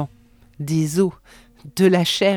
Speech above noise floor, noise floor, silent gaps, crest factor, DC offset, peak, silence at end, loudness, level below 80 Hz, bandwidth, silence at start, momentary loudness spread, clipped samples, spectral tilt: 32 dB; -51 dBFS; none; 16 dB; under 0.1%; -4 dBFS; 0 s; -19 LUFS; -54 dBFS; 19 kHz; 0 s; 16 LU; under 0.1%; -5.5 dB/octave